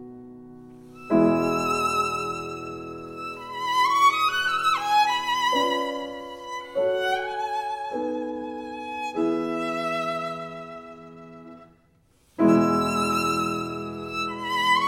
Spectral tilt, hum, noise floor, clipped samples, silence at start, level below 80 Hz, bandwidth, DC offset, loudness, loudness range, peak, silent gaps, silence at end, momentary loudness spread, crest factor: -4.5 dB/octave; none; -61 dBFS; under 0.1%; 0 s; -60 dBFS; 16.5 kHz; under 0.1%; -25 LUFS; 7 LU; -6 dBFS; none; 0 s; 19 LU; 18 dB